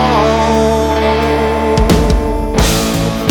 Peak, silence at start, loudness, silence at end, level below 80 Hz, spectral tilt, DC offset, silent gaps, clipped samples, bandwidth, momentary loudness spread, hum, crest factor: 0 dBFS; 0 s; -12 LUFS; 0 s; -20 dBFS; -5 dB/octave; under 0.1%; none; under 0.1%; over 20 kHz; 3 LU; none; 12 dB